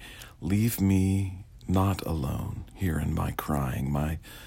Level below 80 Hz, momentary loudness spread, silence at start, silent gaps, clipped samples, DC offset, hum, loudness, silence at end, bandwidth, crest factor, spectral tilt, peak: -42 dBFS; 12 LU; 0 s; none; under 0.1%; under 0.1%; none; -29 LUFS; 0 s; 16.5 kHz; 14 dB; -7 dB/octave; -14 dBFS